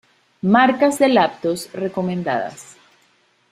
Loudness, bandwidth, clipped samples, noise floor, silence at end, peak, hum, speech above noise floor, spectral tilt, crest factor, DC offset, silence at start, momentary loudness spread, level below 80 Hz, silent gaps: -18 LUFS; 15 kHz; under 0.1%; -60 dBFS; 0.9 s; -2 dBFS; none; 42 dB; -5.5 dB/octave; 18 dB; under 0.1%; 0.45 s; 11 LU; -62 dBFS; none